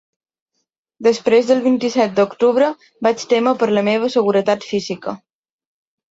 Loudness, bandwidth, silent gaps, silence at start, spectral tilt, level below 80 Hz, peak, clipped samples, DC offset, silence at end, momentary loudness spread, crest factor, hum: -17 LUFS; 7.8 kHz; none; 1 s; -5 dB/octave; -64 dBFS; -2 dBFS; under 0.1%; under 0.1%; 0.95 s; 8 LU; 14 dB; none